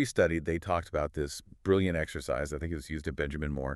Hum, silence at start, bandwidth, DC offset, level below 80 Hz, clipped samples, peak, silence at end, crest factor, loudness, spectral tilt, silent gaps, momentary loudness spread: none; 0 s; 13.5 kHz; under 0.1%; -44 dBFS; under 0.1%; -12 dBFS; 0 s; 18 dB; -32 LUFS; -6 dB/octave; none; 9 LU